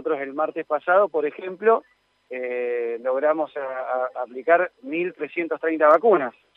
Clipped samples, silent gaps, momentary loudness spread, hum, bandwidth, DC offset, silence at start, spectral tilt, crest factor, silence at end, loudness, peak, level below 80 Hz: under 0.1%; none; 12 LU; none; 4.2 kHz; under 0.1%; 0 s; -7.5 dB/octave; 18 dB; 0.25 s; -23 LUFS; -4 dBFS; -80 dBFS